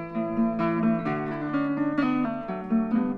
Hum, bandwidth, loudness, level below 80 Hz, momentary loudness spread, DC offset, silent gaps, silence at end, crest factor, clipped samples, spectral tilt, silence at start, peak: none; 5.2 kHz; -26 LUFS; -56 dBFS; 5 LU; under 0.1%; none; 0 s; 12 dB; under 0.1%; -9.5 dB/octave; 0 s; -14 dBFS